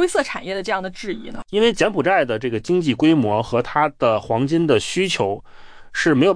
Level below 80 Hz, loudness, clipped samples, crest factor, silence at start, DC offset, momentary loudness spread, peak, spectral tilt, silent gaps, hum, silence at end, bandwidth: -48 dBFS; -19 LUFS; under 0.1%; 14 dB; 0 s; under 0.1%; 10 LU; -4 dBFS; -5 dB/octave; none; none; 0 s; 10.5 kHz